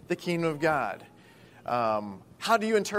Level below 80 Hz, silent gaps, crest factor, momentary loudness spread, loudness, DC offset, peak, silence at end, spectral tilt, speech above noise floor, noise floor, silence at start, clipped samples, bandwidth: -68 dBFS; none; 20 dB; 16 LU; -28 LUFS; under 0.1%; -10 dBFS; 0 s; -5 dB/octave; 26 dB; -54 dBFS; 0.1 s; under 0.1%; 16 kHz